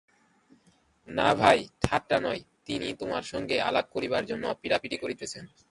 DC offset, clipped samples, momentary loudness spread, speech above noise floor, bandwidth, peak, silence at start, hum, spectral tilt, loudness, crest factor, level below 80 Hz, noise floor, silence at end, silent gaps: under 0.1%; under 0.1%; 13 LU; 37 dB; 11.5 kHz; -4 dBFS; 1.05 s; none; -4.5 dB/octave; -28 LUFS; 24 dB; -54 dBFS; -65 dBFS; 0.25 s; none